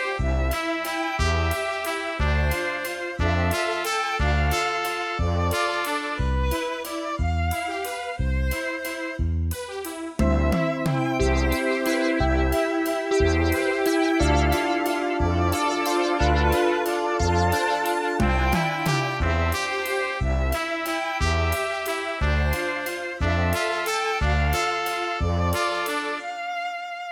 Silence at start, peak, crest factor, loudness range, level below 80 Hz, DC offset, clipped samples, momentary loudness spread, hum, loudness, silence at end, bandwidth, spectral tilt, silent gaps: 0 s; -8 dBFS; 14 dB; 4 LU; -32 dBFS; under 0.1%; under 0.1%; 7 LU; none; -24 LUFS; 0 s; over 20 kHz; -5 dB/octave; none